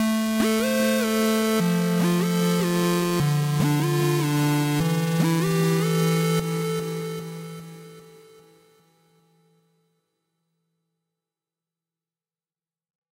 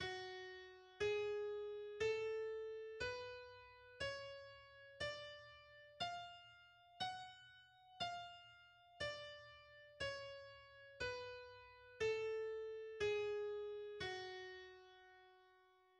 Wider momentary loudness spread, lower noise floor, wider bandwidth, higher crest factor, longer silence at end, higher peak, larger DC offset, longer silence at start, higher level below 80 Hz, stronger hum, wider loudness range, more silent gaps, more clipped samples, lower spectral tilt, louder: second, 10 LU vs 20 LU; first, under -90 dBFS vs -72 dBFS; first, 16 kHz vs 10 kHz; about the same, 14 dB vs 18 dB; first, 5.15 s vs 0.3 s; first, -12 dBFS vs -32 dBFS; neither; about the same, 0 s vs 0 s; first, -58 dBFS vs -74 dBFS; neither; first, 12 LU vs 6 LU; neither; neither; first, -5.5 dB/octave vs -3.5 dB/octave; first, -22 LUFS vs -47 LUFS